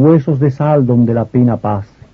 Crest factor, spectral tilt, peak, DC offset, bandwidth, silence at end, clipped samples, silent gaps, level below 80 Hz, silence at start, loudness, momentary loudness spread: 12 dB; -11.5 dB/octave; 0 dBFS; under 0.1%; 5.8 kHz; 0.3 s; under 0.1%; none; -46 dBFS; 0 s; -13 LUFS; 7 LU